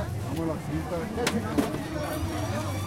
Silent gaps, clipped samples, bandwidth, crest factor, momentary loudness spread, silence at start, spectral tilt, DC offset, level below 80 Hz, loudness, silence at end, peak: none; under 0.1%; 16 kHz; 18 dB; 4 LU; 0 s; -5.5 dB/octave; under 0.1%; -44 dBFS; -30 LUFS; 0 s; -10 dBFS